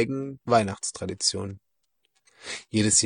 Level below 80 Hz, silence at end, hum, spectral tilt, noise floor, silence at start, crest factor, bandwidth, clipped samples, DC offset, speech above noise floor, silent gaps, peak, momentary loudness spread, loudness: -62 dBFS; 0 s; none; -3 dB/octave; -76 dBFS; 0 s; 20 dB; 10.5 kHz; under 0.1%; under 0.1%; 50 dB; none; -8 dBFS; 15 LU; -26 LUFS